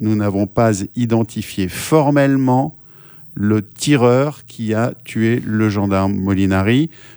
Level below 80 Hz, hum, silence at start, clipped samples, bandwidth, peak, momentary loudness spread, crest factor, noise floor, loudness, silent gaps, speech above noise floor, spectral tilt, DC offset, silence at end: -52 dBFS; none; 0 s; under 0.1%; over 20 kHz; 0 dBFS; 8 LU; 16 dB; -41 dBFS; -17 LUFS; none; 25 dB; -6.5 dB/octave; under 0.1%; 0.05 s